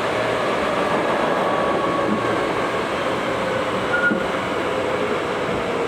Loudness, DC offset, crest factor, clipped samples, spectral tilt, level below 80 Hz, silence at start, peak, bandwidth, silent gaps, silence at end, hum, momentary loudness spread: -21 LUFS; under 0.1%; 14 dB; under 0.1%; -5 dB/octave; -48 dBFS; 0 s; -8 dBFS; 17.5 kHz; none; 0 s; none; 3 LU